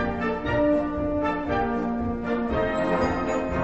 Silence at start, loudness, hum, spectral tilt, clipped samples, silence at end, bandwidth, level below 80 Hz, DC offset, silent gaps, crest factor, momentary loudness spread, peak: 0 s; -25 LUFS; none; -7.5 dB/octave; under 0.1%; 0 s; 8.2 kHz; -40 dBFS; 0.5%; none; 14 dB; 4 LU; -10 dBFS